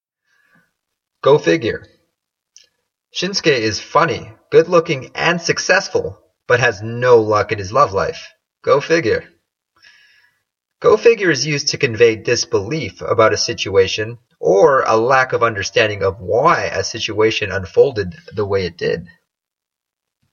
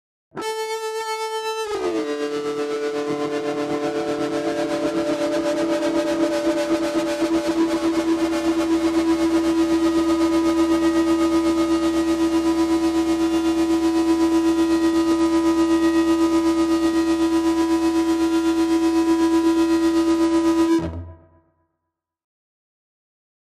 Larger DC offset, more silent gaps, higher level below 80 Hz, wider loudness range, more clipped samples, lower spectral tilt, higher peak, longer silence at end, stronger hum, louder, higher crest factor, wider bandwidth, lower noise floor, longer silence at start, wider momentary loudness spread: neither; neither; second, -52 dBFS vs -46 dBFS; about the same, 5 LU vs 6 LU; neither; about the same, -4 dB/octave vs -4.5 dB/octave; first, 0 dBFS vs -8 dBFS; second, 1.25 s vs 2.4 s; neither; first, -16 LUFS vs -20 LUFS; about the same, 16 dB vs 12 dB; second, 7.2 kHz vs 13.5 kHz; first, -84 dBFS vs -80 dBFS; first, 1.25 s vs 0.35 s; first, 10 LU vs 7 LU